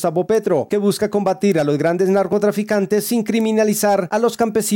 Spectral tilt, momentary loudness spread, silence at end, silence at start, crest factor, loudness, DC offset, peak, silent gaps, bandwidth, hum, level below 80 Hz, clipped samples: -5.5 dB/octave; 3 LU; 0 s; 0 s; 10 dB; -17 LUFS; under 0.1%; -6 dBFS; none; 17 kHz; none; -58 dBFS; under 0.1%